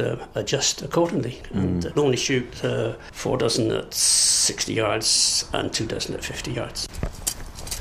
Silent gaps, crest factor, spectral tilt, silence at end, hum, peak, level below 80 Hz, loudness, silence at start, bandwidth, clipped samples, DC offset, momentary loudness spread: none; 18 dB; -3 dB/octave; 0 s; none; -6 dBFS; -42 dBFS; -22 LUFS; 0 s; 15.5 kHz; under 0.1%; under 0.1%; 12 LU